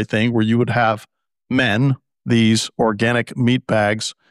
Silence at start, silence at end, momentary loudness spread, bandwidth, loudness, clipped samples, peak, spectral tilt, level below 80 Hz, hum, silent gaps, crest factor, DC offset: 0 s; 0.2 s; 5 LU; 12.5 kHz; -18 LUFS; under 0.1%; -6 dBFS; -5.5 dB/octave; -54 dBFS; none; none; 12 dB; under 0.1%